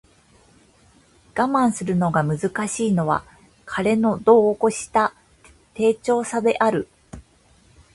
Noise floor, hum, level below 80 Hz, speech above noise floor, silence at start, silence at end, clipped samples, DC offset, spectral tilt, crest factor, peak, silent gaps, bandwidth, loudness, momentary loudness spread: -56 dBFS; none; -54 dBFS; 36 dB; 1.35 s; 0.75 s; under 0.1%; under 0.1%; -6 dB/octave; 20 dB; -2 dBFS; none; 11.5 kHz; -21 LUFS; 10 LU